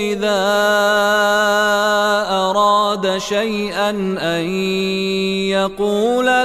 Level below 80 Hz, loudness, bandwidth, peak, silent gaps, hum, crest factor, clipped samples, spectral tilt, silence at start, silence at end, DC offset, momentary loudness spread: -50 dBFS; -16 LUFS; 16 kHz; -2 dBFS; none; none; 14 dB; under 0.1%; -4 dB/octave; 0 s; 0 s; under 0.1%; 5 LU